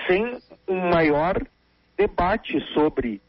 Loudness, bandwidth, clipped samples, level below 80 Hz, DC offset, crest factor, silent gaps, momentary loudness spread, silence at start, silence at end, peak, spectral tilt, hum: -23 LUFS; 5.8 kHz; under 0.1%; -42 dBFS; under 0.1%; 16 dB; none; 13 LU; 0 s; 0.1 s; -8 dBFS; -4.5 dB/octave; none